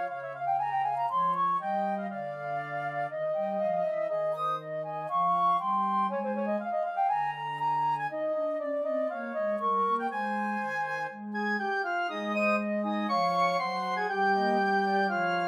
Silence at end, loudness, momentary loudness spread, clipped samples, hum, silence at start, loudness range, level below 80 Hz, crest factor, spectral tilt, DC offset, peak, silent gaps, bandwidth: 0 s; -29 LUFS; 7 LU; under 0.1%; none; 0 s; 3 LU; -90 dBFS; 14 dB; -6 dB/octave; under 0.1%; -16 dBFS; none; 13 kHz